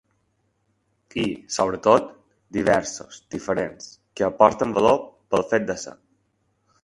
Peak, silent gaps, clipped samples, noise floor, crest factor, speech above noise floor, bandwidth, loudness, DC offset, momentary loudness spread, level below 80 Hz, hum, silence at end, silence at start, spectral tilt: 0 dBFS; none; under 0.1%; -70 dBFS; 24 dB; 48 dB; 11.5 kHz; -22 LUFS; under 0.1%; 17 LU; -56 dBFS; none; 1.05 s; 1.15 s; -4.5 dB/octave